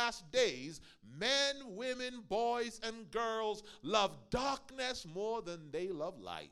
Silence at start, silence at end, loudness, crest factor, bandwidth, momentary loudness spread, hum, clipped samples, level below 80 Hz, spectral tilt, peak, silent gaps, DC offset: 0 s; 0.05 s; -37 LUFS; 22 dB; 14 kHz; 10 LU; none; under 0.1%; -62 dBFS; -2.5 dB/octave; -18 dBFS; none; under 0.1%